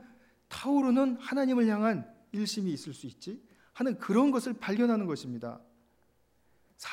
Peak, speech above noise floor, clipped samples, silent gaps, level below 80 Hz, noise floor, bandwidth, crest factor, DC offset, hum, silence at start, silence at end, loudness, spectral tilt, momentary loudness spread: -16 dBFS; 40 dB; under 0.1%; none; -74 dBFS; -69 dBFS; 15 kHz; 16 dB; under 0.1%; none; 0.5 s; 0 s; -30 LUFS; -6 dB/octave; 17 LU